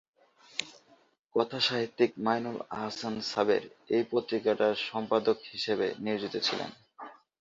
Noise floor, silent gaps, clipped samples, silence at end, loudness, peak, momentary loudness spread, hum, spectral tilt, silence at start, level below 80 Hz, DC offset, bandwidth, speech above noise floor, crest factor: -61 dBFS; 1.19-1.29 s; under 0.1%; 0.25 s; -31 LUFS; -10 dBFS; 10 LU; none; -4.5 dB/octave; 0.55 s; -74 dBFS; under 0.1%; 7.8 kHz; 31 dB; 20 dB